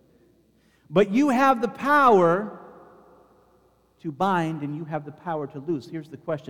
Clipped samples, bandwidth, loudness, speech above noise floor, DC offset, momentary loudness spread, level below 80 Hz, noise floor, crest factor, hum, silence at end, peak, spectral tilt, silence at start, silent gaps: under 0.1%; 17.5 kHz; -23 LUFS; 39 dB; under 0.1%; 19 LU; -66 dBFS; -62 dBFS; 18 dB; none; 0.1 s; -6 dBFS; -6.5 dB/octave; 0.9 s; none